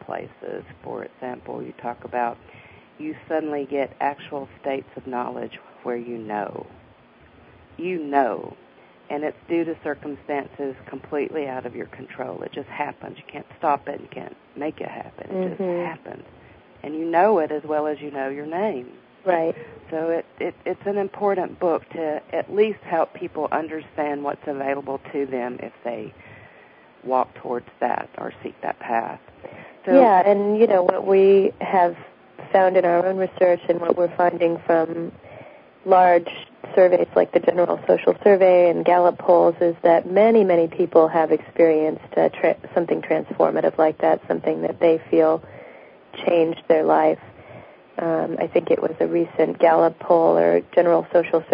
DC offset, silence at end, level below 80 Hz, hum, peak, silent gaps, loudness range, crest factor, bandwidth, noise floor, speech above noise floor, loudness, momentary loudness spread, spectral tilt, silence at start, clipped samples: under 0.1%; 0 s; -64 dBFS; none; -2 dBFS; none; 13 LU; 20 dB; 5.2 kHz; -51 dBFS; 31 dB; -21 LUFS; 18 LU; -11 dB/octave; 0.1 s; under 0.1%